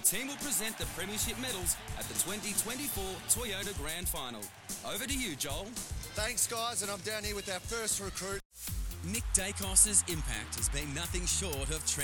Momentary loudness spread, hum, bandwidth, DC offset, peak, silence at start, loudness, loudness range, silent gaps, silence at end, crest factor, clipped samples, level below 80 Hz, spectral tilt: 10 LU; none; 19 kHz; under 0.1%; -10 dBFS; 0 s; -33 LUFS; 5 LU; 8.45-8.50 s; 0 s; 24 dB; under 0.1%; -44 dBFS; -2 dB/octave